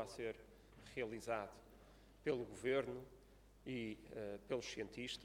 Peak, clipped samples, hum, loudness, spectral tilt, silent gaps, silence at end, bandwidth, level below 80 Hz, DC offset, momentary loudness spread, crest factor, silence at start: -26 dBFS; under 0.1%; none; -46 LUFS; -4.5 dB/octave; none; 0 s; 16.5 kHz; -68 dBFS; under 0.1%; 22 LU; 20 dB; 0 s